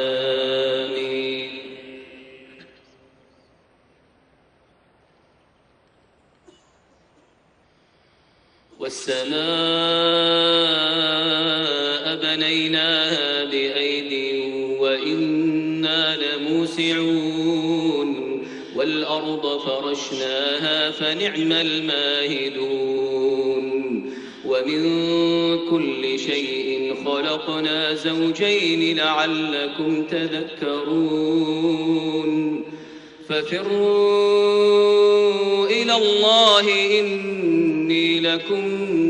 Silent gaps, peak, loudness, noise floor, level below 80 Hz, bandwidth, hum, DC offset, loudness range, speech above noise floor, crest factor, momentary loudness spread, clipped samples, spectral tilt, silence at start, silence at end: none; -4 dBFS; -20 LUFS; -59 dBFS; -66 dBFS; 10 kHz; none; under 0.1%; 7 LU; 39 dB; 18 dB; 9 LU; under 0.1%; -4 dB/octave; 0 s; 0 s